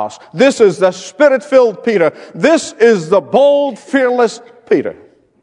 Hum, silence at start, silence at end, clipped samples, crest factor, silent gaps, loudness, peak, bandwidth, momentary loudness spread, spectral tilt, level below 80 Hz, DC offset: none; 0 s; 0.5 s; 0.2%; 12 dB; none; -12 LUFS; 0 dBFS; 10.5 kHz; 6 LU; -5 dB/octave; -62 dBFS; under 0.1%